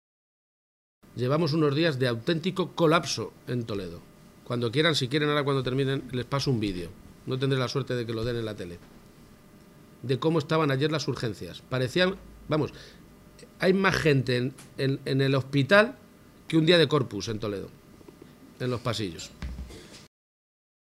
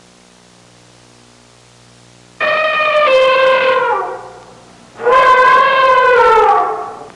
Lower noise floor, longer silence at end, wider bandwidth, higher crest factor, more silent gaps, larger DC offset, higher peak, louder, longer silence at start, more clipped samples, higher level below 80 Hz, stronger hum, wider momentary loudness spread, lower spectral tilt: first, -53 dBFS vs -45 dBFS; first, 1 s vs 0.05 s; first, 15 kHz vs 11 kHz; first, 22 dB vs 10 dB; neither; neither; second, -6 dBFS vs -2 dBFS; second, -27 LUFS vs -10 LUFS; second, 1.15 s vs 2.4 s; neither; about the same, -52 dBFS vs -50 dBFS; second, none vs 60 Hz at -50 dBFS; first, 17 LU vs 11 LU; first, -6 dB/octave vs -2.5 dB/octave